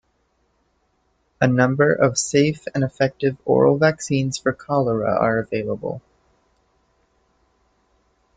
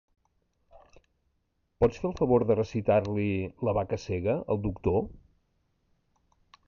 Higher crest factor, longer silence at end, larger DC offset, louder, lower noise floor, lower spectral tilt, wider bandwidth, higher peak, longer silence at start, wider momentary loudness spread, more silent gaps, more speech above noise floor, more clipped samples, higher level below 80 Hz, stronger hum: about the same, 18 dB vs 18 dB; first, 2.4 s vs 1.55 s; neither; first, -20 LUFS vs -28 LUFS; second, -66 dBFS vs -75 dBFS; second, -5.5 dB/octave vs -8.5 dB/octave; first, 9.4 kHz vs 7.2 kHz; first, -4 dBFS vs -12 dBFS; first, 1.4 s vs 0.75 s; about the same, 8 LU vs 6 LU; neither; about the same, 47 dB vs 48 dB; neither; second, -56 dBFS vs -48 dBFS; neither